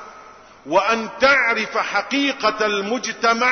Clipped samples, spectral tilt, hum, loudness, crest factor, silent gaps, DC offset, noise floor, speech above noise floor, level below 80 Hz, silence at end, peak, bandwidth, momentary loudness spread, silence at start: under 0.1%; -2.5 dB/octave; none; -19 LUFS; 16 dB; none; under 0.1%; -44 dBFS; 25 dB; -56 dBFS; 0 s; -4 dBFS; 6.6 kHz; 6 LU; 0 s